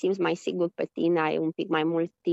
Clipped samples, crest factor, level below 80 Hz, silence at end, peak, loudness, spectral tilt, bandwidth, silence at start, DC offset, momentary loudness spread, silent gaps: under 0.1%; 14 dB; -78 dBFS; 0 s; -12 dBFS; -27 LUFS; -6.5 dB/octave; 8 kHz; 0.05 s; under 0.1%; 4 LU; none